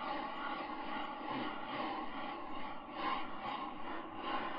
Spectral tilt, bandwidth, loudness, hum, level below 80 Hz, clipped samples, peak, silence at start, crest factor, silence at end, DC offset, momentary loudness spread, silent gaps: -1.5 dB/octave; 5.4 kHz; -42 LUFS; none; -64 dBFS; under 0.1%; -26 dBFS; 0 s; 16 dB; 0 s; under 0.1%; 5 LU; none